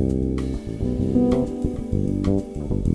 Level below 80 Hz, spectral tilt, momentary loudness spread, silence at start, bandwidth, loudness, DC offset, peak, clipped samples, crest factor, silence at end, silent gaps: -30 dBFS; -9.5 dB/octave; 7 LU; 0 s; 11 kHz; -24 LUFS; under 0.1%; -6 dBFS; under 0.1%; 16 dB; 0 s; none